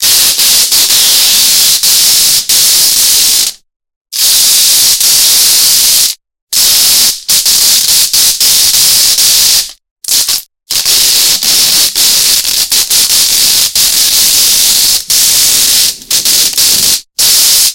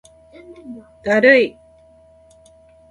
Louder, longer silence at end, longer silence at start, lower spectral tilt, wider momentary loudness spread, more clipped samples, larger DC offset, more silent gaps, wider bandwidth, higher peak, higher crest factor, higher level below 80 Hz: first, -4 LUFS vs -15 LUFS; second, 0 s vs 1.4 s; second, 0 s vs 0.65 s; second, 2.5 dB/octave vs -5 dB/octave; second, 5 LU vs 26 LU; first, 2% vs under 0.1%; first, 1% vs under 0.1%; first, 3.76-3.80 s, 3.96-4.05 s, 6.42-6.47 s, 9.91-9.96 s vs none; first, over 20 kHz vs 10.5 kHz; about the same, 0 dBFS vs 0 dBFS; second, 8 dB vs 20 dB; first, -42 dBFS vs -58 dBFS